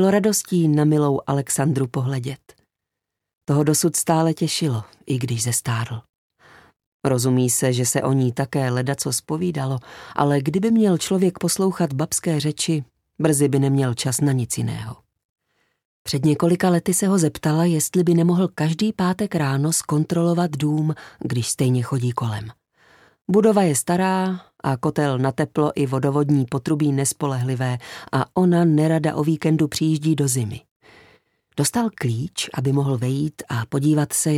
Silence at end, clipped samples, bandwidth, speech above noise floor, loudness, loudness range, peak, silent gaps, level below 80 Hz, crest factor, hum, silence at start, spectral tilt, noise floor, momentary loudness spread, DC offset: 0 s; under 0.1%; 16 kHz; 63 dB; -21 LUFS; 3 LU; -4 dBFS; 3.37-3.41 s, 6.09-6.30 s, 6.86-7.00 s, 15.25-15.36 s, 15.85-16.05 s, 30.71-30.80 s; -58 dBFS; 16 dB; none; 0 s; -5.5 dB/octave; -83 dBFS; 9 LU; under 0.1%